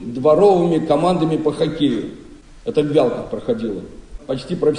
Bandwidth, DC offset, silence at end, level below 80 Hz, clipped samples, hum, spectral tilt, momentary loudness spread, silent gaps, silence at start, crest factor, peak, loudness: 10 kHz; under 0.1%; 0 s; -44 dBFS; under 0.1%; none; -7.5 dB/octave; 17 LU; none; 0 s; 16 dB; -2 dBFS; -18 LUFS